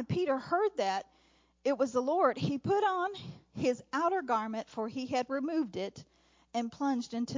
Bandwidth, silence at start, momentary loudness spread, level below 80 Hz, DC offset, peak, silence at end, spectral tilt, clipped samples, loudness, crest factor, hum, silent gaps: 7.6 kHz; 0 s; 9 LU; -68 dBFS; under 0.1%; -14 dBFS; 0 s; -6 dB/octave; under 0.1%; -33 LUFS; 18 dB; none; none